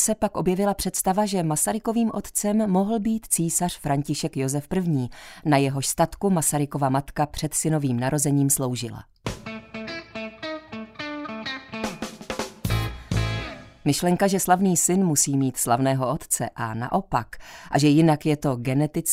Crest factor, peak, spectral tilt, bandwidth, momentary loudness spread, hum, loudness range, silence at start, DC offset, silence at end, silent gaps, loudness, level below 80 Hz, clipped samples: 18 dB; -4 dBFS; -5 dB/octave; 16 kHz; 14 LU; none; 9 LU; 0 s; under 0.1%; 0 s; none; -24 LUFS; -44 dBFS; under 0.1%